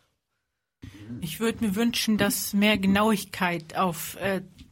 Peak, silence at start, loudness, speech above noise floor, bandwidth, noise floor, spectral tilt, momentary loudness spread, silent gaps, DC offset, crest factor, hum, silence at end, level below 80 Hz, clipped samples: -10 dBFS; 0.85 s; -25 LUFS; 55 dB; 16.5 kHz; -81 dBFS; -4.5 dB/octave; 12 LU; none; under 0.1%; 18 dB; none; 0.1 s; -56 dBFS; under 0.1%